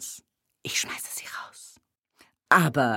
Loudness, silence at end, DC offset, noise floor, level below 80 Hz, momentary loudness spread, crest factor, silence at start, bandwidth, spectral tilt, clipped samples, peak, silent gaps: -25 LUFS; 0 s; under 0.1%; -63 dBFS; -68 dBFS; 23 LU; 24 dB; 0 s; 17 kHz; -3.5 dB/octave; under 0.1%; -4 dBFS; none